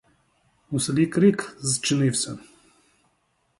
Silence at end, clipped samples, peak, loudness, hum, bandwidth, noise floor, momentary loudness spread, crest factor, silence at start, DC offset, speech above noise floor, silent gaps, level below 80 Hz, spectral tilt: 1.2 s; under 0.1%; -6 dBFS; -23 LUFS; none; 11.5 kHz; -69 dBFS; 12 LU; 18 dB; 0.7 s; under 0.1%; 47 dB; none; -62 dBFS; -4.5 dB/octave